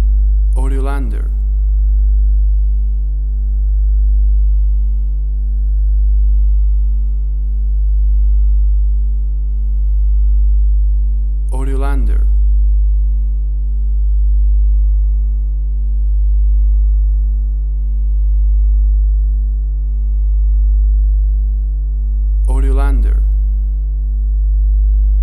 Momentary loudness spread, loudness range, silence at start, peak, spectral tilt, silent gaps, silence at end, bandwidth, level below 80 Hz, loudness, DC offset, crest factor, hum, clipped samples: 5 LU; 1 LU; 0 s; -4 dBFS; -9.5 dB/octave; none; 0 s; 1.6 kHz; -12 dBFS; -16 LUFS; under 0.1%; 8 dB; none; under 0.1%